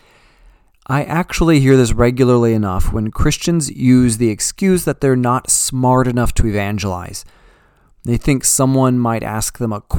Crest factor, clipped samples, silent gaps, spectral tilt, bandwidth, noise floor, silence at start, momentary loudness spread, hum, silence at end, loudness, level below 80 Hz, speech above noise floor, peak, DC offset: 16 dB; under 0.1%; none; -5 dB/octave; 19 kHz; -51 dBFS; 0.9 s; 9 LU; none; 0 s; -15 LUFS; -26 dBFS; 37 dB; 0 dBFS; under 0.1%